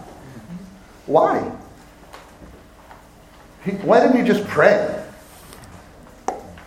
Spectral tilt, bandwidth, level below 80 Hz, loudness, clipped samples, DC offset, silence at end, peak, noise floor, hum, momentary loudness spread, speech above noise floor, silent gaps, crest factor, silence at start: -6.5 dB/octave; 16 kHz; -52 dBFS; -18 LUFS; under 0.1%; under 0.1%; 0.05 s; 0 dBFS; -46 dBFS; none; 26 LU; 30 dB; none; 20 dB; 0 s